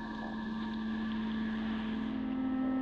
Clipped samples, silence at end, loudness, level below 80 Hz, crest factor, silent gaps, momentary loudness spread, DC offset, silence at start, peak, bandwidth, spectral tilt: under 0.1%; 0 s; -36 LUFS; -54 dBFS; 10 dB; none; 5 LU; under 0.1%; 0 s; -26 dBFS; 6.4 kHz; -7.5 dB/octave